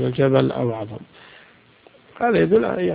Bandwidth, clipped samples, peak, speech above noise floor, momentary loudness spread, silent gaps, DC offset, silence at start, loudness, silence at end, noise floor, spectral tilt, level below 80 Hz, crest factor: 5 kHz; under 0.1%; -4 dBFS; 32 dB; 15 LU; none; under 0.1%; 0 s; -19 LUFS; 0 s; -52 dBFS; -12 dB/octave; -54 dBFS; 18 dB